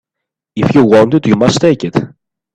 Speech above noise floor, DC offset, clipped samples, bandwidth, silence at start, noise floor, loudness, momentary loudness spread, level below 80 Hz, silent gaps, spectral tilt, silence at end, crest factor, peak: 70 dB; under 0.1%; under 0.1%; 10 kHz; 0.55 s; -79 dBFS; -11 LUFS; 12 LU; -44 dBFS; none; -6.5 dB/octave; 0.45 s; 12 dB; 0 dBFS